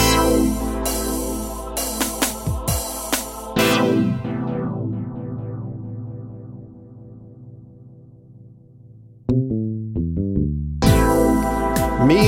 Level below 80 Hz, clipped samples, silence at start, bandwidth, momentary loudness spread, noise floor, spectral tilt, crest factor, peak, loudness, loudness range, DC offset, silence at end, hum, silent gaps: -32 dBFS; under 0.1%; 0 s; 16.5 kHz; 21 LU; -45 dBFS; -5 dB/octave; 20 dB; -2 dBFS; -21 LUFS; 15 LU; under 0.1%; 0 s; none; none